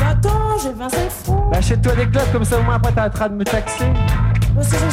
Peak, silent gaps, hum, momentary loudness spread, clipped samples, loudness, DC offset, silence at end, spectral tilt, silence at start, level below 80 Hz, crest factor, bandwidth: -4 dBFS; none; none; 5 LU; under 0.1%; -17 LUFS; under 0.1%; 0 s; -6 dB/octave; 0 s; -22 dBFS; 12 dB; 16 kHz